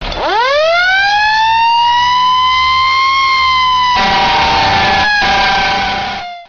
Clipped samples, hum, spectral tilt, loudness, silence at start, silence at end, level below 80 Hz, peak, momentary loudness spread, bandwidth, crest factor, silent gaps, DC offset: under 0.1%; none; 0.5 dB/octave; -10 LUFS; 0 s; 0.05 s; -32 dBFS; -2 dBFS; 3 LU; 7.2 kHz; 8 dB; none; under 0.1%